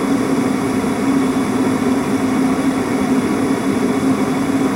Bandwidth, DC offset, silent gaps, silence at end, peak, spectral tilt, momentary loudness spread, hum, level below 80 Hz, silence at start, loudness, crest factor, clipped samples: 16 kHz; under 0.1%; none; 0 s; -6 dBFS; -6 dB/octave; 1 LU; none; -46 dBFS; 0 s; -17 LUFS; 12 dB; under 0.1%